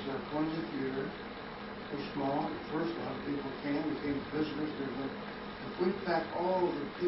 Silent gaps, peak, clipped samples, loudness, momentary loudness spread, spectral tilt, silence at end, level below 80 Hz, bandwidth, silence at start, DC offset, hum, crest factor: none; -20 dBFS; under 0.1%; -36 LUFS; 10 LU; -4.5 dB/octave; 0 s; -60 dBFS; 5.8 kHz; 0 s; under 0.1%; none; 16 dB